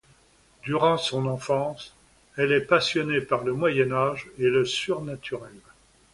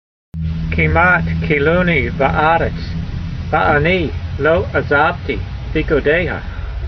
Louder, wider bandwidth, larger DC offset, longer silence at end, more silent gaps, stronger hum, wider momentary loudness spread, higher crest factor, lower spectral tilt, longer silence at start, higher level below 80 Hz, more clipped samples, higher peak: second, -25 LUFS vs -16 LUFS; first, 11.5 kHz vs 6.2 kHz; neither; first, 0.55 s vs 0 s; neither; neither; first, 14 LU vs 11 LU; about the same, 20 dB vs 16 dB; second, -5 dB/octave vs -8 dB/octave; first, 0.65 s vs 0.35 s; second, -60 dBFS vs -26 dBFS; neither; second, -6 dBFS vs 0 dBFS